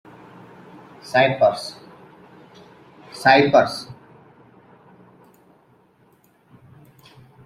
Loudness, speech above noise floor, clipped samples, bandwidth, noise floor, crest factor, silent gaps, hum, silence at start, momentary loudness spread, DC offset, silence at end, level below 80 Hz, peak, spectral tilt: -18 LUFS; 41 dB; under 0.1%; 14 kHz; -57 dBFS; 22 dB; none; none; 1.05 s; 27 LU; under 0.1%; 3.5 s; -64 dBFS; -2 dBFS; -5 dB/octave